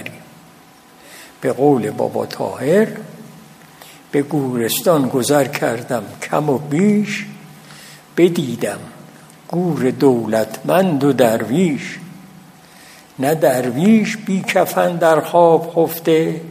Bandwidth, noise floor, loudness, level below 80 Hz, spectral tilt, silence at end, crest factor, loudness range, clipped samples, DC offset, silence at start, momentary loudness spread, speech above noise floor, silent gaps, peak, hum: 15.5 kHz; -45 dBFS; -17 LUFS; -64 dBFS; -6 dB/octave; 0 s; 18 dB; 5 LU; under 0.1%; under 0.1%; 0 s; 12 LU; 29 dB; none; 0 dBFS; none